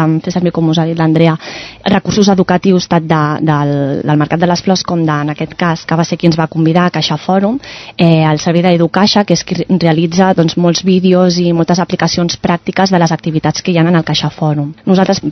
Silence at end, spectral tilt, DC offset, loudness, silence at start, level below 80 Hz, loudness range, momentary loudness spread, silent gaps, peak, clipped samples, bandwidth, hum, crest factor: 0 s; -6 dB/octave; under 0.1%; -12 LUFS; 0 s; -44 dBFS; 2 LU; 5 LU; none; 0 dBFS; 0.2%; 6.4 kHz; none; 10 dB